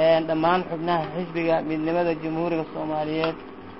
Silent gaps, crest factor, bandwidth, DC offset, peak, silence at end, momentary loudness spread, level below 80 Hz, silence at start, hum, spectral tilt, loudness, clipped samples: none; 16 dB; 5.8 kHz; 0.3%; -8 dBFS; 0 s; 7 LU; -56 dBFS; 0 s; none; -10.5 dB/octave; -25 LUFS; under 0.1%